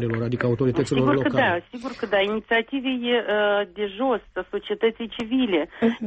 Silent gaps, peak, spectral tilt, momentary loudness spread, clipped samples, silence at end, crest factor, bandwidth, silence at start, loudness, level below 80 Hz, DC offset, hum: none; -8 dBFS; -6.5 dB/octave; 9 LU; under 0.1%; 0 s; 14 dB; 8.4 kHz; 0 s; -23 LUFS; -54 dBFS; under 0.1%; none